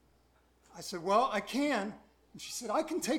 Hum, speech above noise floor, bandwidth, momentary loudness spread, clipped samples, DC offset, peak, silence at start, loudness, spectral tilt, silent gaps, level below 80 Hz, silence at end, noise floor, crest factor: none; 35 dB; 18 kHz; 14 LU; under 0.1%; under 0.1%; -16 dBFS; 0.75 s; -33 LUFS; -3.5 dB/octave; none; -70 dBFS; 0 s; -68 dBFS; 18 dB